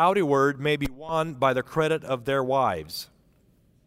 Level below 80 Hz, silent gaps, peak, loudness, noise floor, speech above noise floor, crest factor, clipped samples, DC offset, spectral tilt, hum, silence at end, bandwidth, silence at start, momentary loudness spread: -52 dBFS; none; -8 dBFS; -25 LUFS; -61 dBFS; 37 dB; 16 dB; under 0.1%; under 0.1%; -5.5 dB/octave; none; 0.8 s; 16 kHz; 0 s; 11 LU